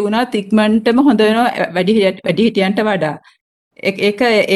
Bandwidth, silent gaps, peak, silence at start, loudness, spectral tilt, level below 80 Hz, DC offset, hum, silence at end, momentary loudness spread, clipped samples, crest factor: 12.5 kHz; 3.41-3.71 s; -2 dBFS; 0 s; -14 LUFS; -6 dB/octave; -54 dBFS; under 0.1%; none; 0 s; 7 LU; under 0.1%; 12 dB